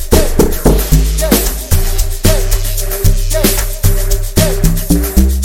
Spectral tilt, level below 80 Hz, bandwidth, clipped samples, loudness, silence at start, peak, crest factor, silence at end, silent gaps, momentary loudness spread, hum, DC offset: -4.5 dB/octave; -12 dBFS; 17.5 kHz; 0.2%; -13 LUFS; 0 s; 0 dBFS; 10 dB; 0 s; none; 4 LU; none; under 0.1%